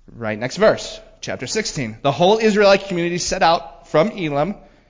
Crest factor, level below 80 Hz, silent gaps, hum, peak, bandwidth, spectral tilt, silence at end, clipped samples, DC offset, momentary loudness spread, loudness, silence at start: 16 dB; -46 dBFS; none; none; -4 dBFS; 7.6 kHz; -4.5 dB/octave; 0.3 s; under 0.1%; under 0.1%; 12 LU; -18 LUFS; 0.1 s